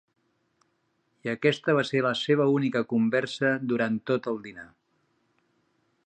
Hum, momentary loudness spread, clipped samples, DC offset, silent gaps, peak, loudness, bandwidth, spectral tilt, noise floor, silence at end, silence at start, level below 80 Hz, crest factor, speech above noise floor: none; 11 LU; under 0.1%; under 0.1%; none; -10 dBFS; -26 LUFS; 9.4 kHz; -6.5 dB/octave; -73 dBFS; 1.4 s; 1.25 s; -74 dBFS; 20 dB; 47 dB